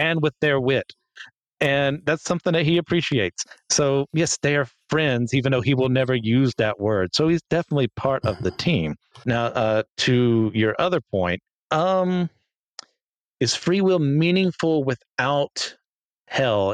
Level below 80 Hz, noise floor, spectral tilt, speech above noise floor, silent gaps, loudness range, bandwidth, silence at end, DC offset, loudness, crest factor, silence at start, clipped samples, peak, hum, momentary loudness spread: -54 dBFS; -80 dBFS; -5 dB/octave; 59 dB; 1.47-1.57 s, 9.90-9.95 s, 11.52-11.68 s, 12.56-12.75 s, 13.04-13.37 s, 15.10-15.16 s, 15.85-16.25 s; 2 LU; 11 kHz; 0 s; under 0.1%; -22 LUFS; 16 dB; 0 s; under 0.1%; -6 dBFS; none; 6 LU